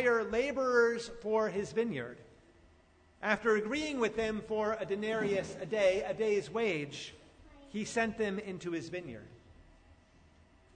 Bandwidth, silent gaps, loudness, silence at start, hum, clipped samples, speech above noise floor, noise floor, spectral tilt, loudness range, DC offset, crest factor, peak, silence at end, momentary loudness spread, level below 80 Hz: 9.6 kHz; none; -33 LUFS; 0 s; none; under 0.1%; 31 dB; -64 dBFS; -4.5 dB/octave; 6 LU; under 0.1%; 20 dB; -14 dBFS; 1.15 s; 12 LU; -62 dBFS